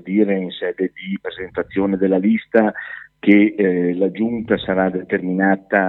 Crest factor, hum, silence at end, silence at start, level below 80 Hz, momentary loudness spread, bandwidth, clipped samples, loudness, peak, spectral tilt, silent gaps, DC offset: 18 dB; none; 0 s; 0.05 s; -54 dBFS; 12 LU; 4.1 kHz; under 0.1%; -19 LUFS; 0 dBFS; -10 dB/octave; none; under 0.1%